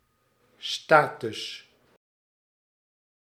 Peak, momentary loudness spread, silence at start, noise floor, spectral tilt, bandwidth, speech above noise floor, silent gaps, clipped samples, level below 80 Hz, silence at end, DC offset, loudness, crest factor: -2 dBFS; 17 LU; 0.6 s; -68 dBFS; -3.5 dB/octave; 15 kHz; 43 dB; none; under 0.1%; -80 dBFS; 1.7 s; under 0.1%; -25 LUFS; 28 dB